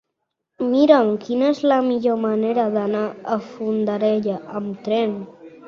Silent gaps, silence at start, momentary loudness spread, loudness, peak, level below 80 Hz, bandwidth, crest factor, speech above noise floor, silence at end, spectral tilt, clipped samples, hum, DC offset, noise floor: none; 0.6 s; 11 LU; -20 LUFS; 0 dBFS; -66 dBFS; 7 kHz; 20 dB; 59 dB; 0 s; -7.5 dB/octave; under 0.1%; none; under 0.1%; -78 dBFS